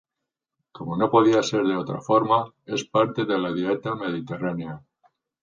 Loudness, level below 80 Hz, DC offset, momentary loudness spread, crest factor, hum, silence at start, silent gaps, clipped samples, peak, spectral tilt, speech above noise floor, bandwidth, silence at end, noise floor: -23 LUFS; -64 dBFS; under 0.1%; 12 LU; 20 dB; none; 0.75 s; none; under 0.1%; -4 dBFS; -6 dB/octave; 62 dB; 7.6 kHz; 0.65 s; -85 dBFS